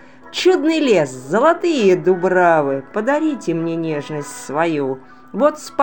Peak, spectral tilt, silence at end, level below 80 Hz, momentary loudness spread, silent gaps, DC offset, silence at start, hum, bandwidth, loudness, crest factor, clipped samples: 0 dBFS; -5.5 dB/octave; 0 s; -66 dBFS; 11 LU; none; 0.5%; 0.25 s; none; 17 kHz; -17 LUFS; 16 dB; under 0.1%